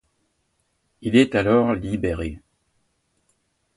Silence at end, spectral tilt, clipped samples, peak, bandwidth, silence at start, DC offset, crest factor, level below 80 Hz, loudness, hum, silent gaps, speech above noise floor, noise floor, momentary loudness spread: 1.4 s; -6.5 dB/octave; under 0.1%; -4 dBFS; 11.5 kHz; 1 s; under 0.1%; 20 dB; -44 dBFS; -21 LUFS; none; none; 51 dB; -70 dBFS; 15 LU